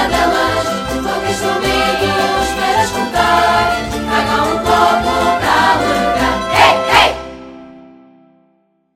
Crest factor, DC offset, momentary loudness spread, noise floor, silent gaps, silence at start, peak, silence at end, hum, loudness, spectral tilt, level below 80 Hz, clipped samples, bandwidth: 14 dB; under 0.1%; 7 LU; -58 dBFS; none; 0 s; 0 dBFS; 1.15 s; none; -13 LUFS; -3.5 dB/octave; -34 dBFS; under 0.1%; 16 kHz